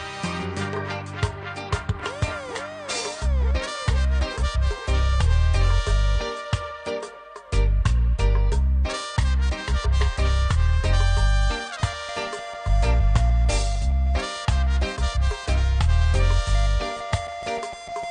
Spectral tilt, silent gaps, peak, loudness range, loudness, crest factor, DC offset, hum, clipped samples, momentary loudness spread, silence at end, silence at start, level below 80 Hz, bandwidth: -5 dB/octave; none; -8 dBFS; 3 LU; -24 LUFS; 14 dB; under 0.1%; none; under 0.1%; 8 LU; 0 s; 0 s; -22 dBFS; 10 kHz